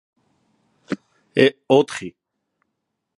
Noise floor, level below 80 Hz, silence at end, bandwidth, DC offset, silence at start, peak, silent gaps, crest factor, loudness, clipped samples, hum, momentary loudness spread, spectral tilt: -77 dBFS; -68 dBFS; 1.1 s; 11.5 kHz; under 0.1%; 0.9 s; 0 dBFS; none; 22 dB; -20 LUFS; under 0.1%; none; 15 LU; -5.5 dB/octave